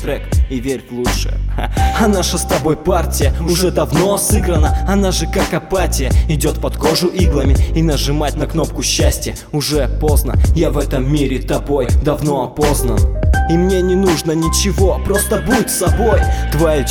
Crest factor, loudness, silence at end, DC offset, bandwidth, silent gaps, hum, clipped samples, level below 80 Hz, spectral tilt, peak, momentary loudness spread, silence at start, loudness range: 14 dB; -15 LUFS; 0 s; under 0.1%; 19 kHz; none; none; under 0.1%; -18 dBFS; -5 dB/octave; 0 dBFS; 5 LU; 0 s; 2 LU